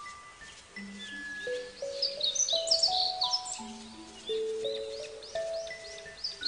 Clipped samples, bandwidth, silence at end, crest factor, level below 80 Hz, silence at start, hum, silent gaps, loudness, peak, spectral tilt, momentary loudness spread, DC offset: under 0.1%; 10 kHz; 0 s; 20 dB; -66 dBFS; 0 s; none; none; -31 LUFS; -14 dBFS; 0 dB/octave; 20 LU; under 0.1%